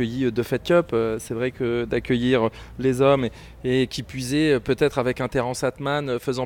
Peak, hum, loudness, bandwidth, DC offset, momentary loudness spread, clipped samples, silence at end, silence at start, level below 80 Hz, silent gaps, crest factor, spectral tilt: -6 dBFS; none; -23 LUFS; 18 kHz; under 0.1%; 7 LU; under 0.1%; 0 s; 0 s; -46 dBFS; none; 16 dB; -6 dB/octave